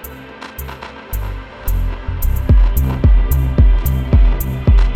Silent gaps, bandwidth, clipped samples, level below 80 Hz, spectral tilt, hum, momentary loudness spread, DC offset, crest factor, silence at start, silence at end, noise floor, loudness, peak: none; 16.5 kHz; under 0.1%; -14 dBFS; -7 dB/octave; none; 16 LU; under 0.1%; 12 dB; 0 s; 0 s; -33 dBFS; -16 LUFS; -2 dBFS